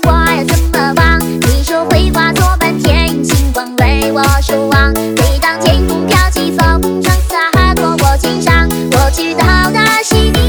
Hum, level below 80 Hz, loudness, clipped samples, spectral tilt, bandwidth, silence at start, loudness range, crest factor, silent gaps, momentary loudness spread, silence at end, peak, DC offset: none; -14 dBFS; -11 LUFS; 0.2%; -5 dB/octave; over 20 kHz; 0 s; 1 LU; 10 dB; none; 3 LU; 0 s; 0 dBFS; under 0.1%